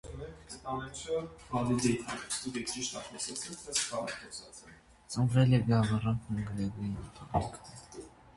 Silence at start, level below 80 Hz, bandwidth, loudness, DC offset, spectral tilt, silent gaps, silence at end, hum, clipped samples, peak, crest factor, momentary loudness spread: 0.05 s; -54 dBFS; 11.5 kHz; -33 LUFS; under 0.1%; -5 dB/octave; none; 0.05 s; none; under 0.1%; -14 dBFS; 20 dB; 18 LU